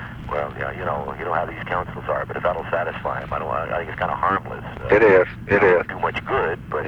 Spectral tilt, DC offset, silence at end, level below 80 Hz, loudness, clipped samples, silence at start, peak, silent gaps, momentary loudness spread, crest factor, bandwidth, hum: -7.5 dB/octave; under 0.1%; 0 s; -42 dBFS; -22 LUFS; under 0.1%; 0 s; -4 dBFS; none; 11 LU; 18 dB; 7.2 kHz; none